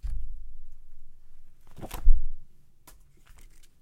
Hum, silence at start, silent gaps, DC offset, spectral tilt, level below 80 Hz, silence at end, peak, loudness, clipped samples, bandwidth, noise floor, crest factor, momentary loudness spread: none; 0.05 s; none; under 0.1%; -6 dB/octave; -28 dBFS; 1.4 s; -4 dBFS; -34 LUFS; under 0.1%; 2.7 kHz; -52 dBFS; 20 dB; 28 LU